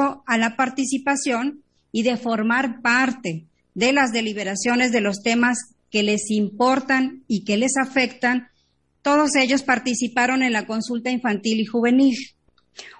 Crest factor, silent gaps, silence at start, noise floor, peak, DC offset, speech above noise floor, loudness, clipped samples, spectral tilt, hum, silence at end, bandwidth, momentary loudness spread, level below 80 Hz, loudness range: 16 dB; none; 0 s; -66 dBFS; -4 dBFS; under 0.1%; 45 dB; -21 LUFS; under 0.1%; -3.5 dB/octave; none; 0.05 s; 11 kHz; 8 LU; -64 dBFS; 1 LU